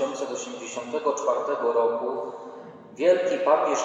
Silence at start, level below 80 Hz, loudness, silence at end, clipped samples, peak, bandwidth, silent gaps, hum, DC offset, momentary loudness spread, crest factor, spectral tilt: 0 s; -84 dBFS; -25 LUFS; 0 s; under 0.1%; -8 dBFS; 8.2 kHz; none; none; under 0.1%; 17 LU; 18 dB; -3 dB/octave